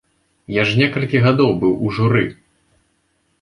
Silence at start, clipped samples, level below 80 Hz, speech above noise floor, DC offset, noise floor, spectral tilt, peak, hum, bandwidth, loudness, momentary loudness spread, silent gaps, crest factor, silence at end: 0.5 s; under 0.1%; -48 dBFS; 49 dB; under 0.1%; -65 dBFS; -7.5 dB/octave; -2 dBFS; none; 10.5 kHz; -17 LUFS; 5 LU; none; 16 dB; 1.1 s